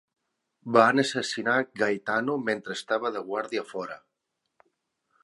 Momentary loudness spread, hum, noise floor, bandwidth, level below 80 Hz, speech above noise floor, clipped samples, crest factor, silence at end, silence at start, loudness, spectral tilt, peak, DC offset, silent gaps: 15 LU; none; -81 dBFS; 11.5 kHz; -78 dBFS; 55 dB; under 0.1%; 24 dB; 1.3 s; 0.65 s; -26 LUFS; -4 dB/octave; -4 dBFS; under 0.1%; none